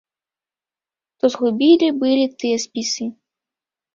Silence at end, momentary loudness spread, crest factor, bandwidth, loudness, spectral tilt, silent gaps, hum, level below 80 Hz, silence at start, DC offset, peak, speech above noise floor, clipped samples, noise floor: 0.85 s; 9 LU; 18 dB; 7.6 kHz; -18 LUFS; -3.5 dB/octave; none; none; -66 dBFS; 1.25 s; under 0.1%; -2 dBFS; over 73 dB; under 0.1%; under -90 dBFS